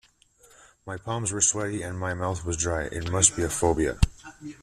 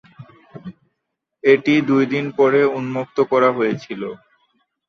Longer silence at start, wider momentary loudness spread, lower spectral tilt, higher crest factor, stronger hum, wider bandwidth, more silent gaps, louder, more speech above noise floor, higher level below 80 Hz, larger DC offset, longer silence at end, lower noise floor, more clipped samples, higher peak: first, 0.85 s vs 0.2 s; second, 17 LU vs 21 LU; second, -3.5 dB/octave vs -7 dB/octave; first, 24 dB vs 18 dB; neither; first, 14 kHz vs 6.6 kHz; neither; second, -25 LUFS vs -18 LUFS; second, 33 dB vs 60 dB; first, -40 dBFS vs -66 dBFS; neither; second, 0.05 s vs 0.7 s; second, -59 dBFS vs -78 dBFS; neither; about the same, -4 dBFS vs -2 dBFS